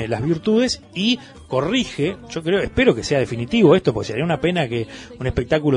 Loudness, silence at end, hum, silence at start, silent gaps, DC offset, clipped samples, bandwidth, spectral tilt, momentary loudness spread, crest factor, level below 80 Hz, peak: -20 LUFS; 0 s; none; 0 s; none; under 0.1%; under 0.1%; 11 kHz; -5.5 dB/octave; 9 LU; 18 dB; -42 dBFS; -2 dBFS